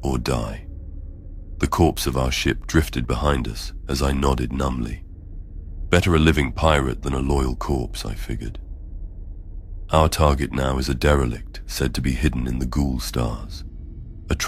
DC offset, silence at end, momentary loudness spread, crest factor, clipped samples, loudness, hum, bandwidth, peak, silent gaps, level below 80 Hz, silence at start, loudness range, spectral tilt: under 0.1%; 0 s; 20 LU; 22 dB; under 0.1%; -22 LUFS; none; 16 kHz; 0 dBFS; none; -28 dBFS; 0 s; 3 LU; -5.5 dB/octave